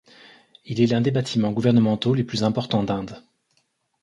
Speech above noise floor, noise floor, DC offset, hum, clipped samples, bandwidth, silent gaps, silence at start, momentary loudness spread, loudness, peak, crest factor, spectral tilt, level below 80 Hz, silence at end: 48 dB; -69 dBFS; under 0.1%; none; under 0.1%; 11 kHz; none; 0.65 s; 9 LU; -22 LUFS; -6 dBFS; 18 dB; -7 dB/octave; -56 dBFS; 0.85 s